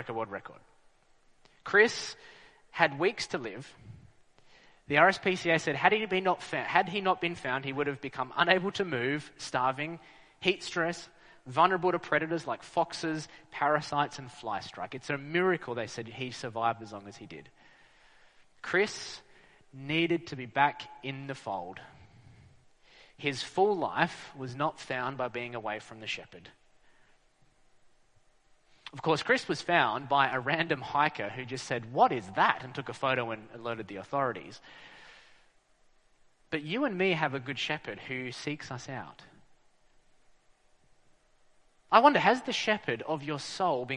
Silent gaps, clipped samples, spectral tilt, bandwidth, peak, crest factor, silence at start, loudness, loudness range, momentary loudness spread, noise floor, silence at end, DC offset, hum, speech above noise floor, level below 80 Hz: none; under 0.1%; -4.5 dB/octave; 10.5 kHz; -6 dBFS; 26 dB; 0 s; -30 LUFS; 10 LU; 17 LU; -65 dBFS; 0 s; under 0.1%; none; 34 dB; -70 dBFS